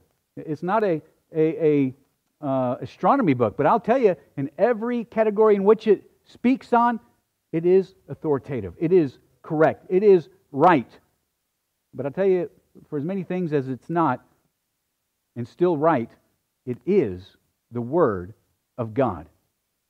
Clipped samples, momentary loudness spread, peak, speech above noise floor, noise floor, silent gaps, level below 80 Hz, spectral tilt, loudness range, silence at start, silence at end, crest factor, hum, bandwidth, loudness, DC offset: under 0.1%; 16 LU; -4 dBFS; 55 dB; -76 dBFS; none; -64 dBFS; -9 dB/octave; 5 LU; 0.35 s; 0.65 s; 18 dB; none; 6.6 kHz; -22 LUFS; under 0.1%